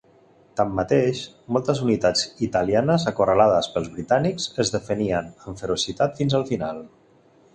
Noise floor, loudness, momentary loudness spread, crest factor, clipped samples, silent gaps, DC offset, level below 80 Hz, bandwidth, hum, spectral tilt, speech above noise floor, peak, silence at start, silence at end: -56 dBFS; -22 LUFS; 9 LU; 20 dB; under 0.1%; none; under 0.1%; -50 dBFS; 10 kHz; none; -5 dB/octave; 34 dB; -4 dBFS; 0.55 s; 0.65 s